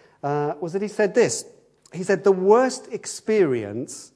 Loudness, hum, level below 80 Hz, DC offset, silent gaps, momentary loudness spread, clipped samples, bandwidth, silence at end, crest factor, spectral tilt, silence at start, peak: -22 LUFS; none; -72 dBFS; under 0.1%; none; 14 LU; under 0.1%; 11 kHz; 0.1 s; 20 dB; -5 dB/octave; 0.25 s; -4 dBFS